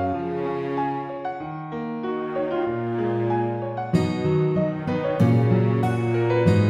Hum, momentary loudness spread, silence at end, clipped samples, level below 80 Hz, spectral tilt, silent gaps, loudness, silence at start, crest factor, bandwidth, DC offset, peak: none; 11 LU; 0 s; under 0.1%; -56 dBFS; -9 dB/octave; none; -24 LUFS; 0 s; 16 dB; 9.2 kHz; under 0.1%; -8 dBFS